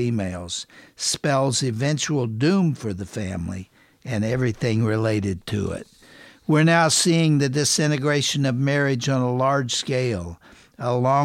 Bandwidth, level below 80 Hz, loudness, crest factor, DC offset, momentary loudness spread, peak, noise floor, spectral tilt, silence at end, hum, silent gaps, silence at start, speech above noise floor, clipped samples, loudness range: 15.5 kHz; -52 dBFS; -22 LUFS; 16 dB; under 0.1%; 13 LU; -6 dBFS; -48 dBFS; -4.5 dB/octave; 0 s; none; none; 0 s; 27 dB; under 0.1%; 6 LU